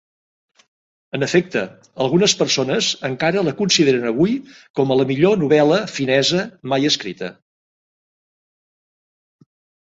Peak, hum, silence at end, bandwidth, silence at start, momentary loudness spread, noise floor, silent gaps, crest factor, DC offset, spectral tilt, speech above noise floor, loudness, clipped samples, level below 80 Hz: -2 dBFS; none; 2.55 s; 8 kHz; 1.15 s; 11 LU; under -90 dBFS; 4.70-4.74 s; 18 dB; under 0.1%; -4 dB/octave; over 72 dB; -18 LUFS; under 0.1%; -60 dBFS